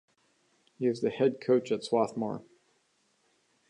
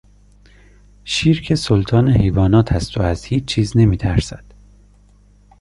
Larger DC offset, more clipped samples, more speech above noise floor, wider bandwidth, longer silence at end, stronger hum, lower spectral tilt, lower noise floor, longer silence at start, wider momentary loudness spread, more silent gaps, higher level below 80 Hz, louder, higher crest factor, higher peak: neither; neither; first, 43 dB vs 34 dB; about the same, 10.5 kHz vs 11.5 kHz; about the same, 1.3 s vs 1.25 s; second, none vs 50 Hz at -35 dBFS; about the same, -6.5 dB/octave vs -6.5 dB/octave; first, -72 dBFS vs -49 dBFS; second, 0.8 s vs 1.05 s; about the same, 8 LU vs 7 LU; neither; second, -78 dBFS vs -30 dBFS; second, -30 LUFS vs -16 LUFS; about the same, 18 dB vs 16 dB; second, -14 dBFS vs -2 dBFS